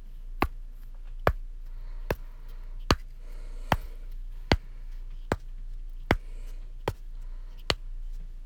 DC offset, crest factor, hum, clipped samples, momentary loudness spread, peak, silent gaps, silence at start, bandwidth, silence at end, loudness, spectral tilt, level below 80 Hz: under 0.1%; 30 dB; none; under 0.1%; 18 LU; -4 dBFS; none; 0 s; 17.5 kHz; 0 s; -32 LUFS; -5 dB/octave; -36 dBFS